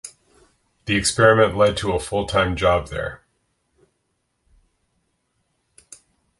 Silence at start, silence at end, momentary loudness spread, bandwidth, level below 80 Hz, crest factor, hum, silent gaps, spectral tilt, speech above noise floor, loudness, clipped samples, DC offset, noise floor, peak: 0.05 s; 3.25 s; 16 LU; 11.5 kHz; -42 dBFS; 22 dB; none; none; -4 dB/octave; 53 dB; -19 LUFS; under 0.1%; under 0.1%; -72 dBFS; -2 dBFS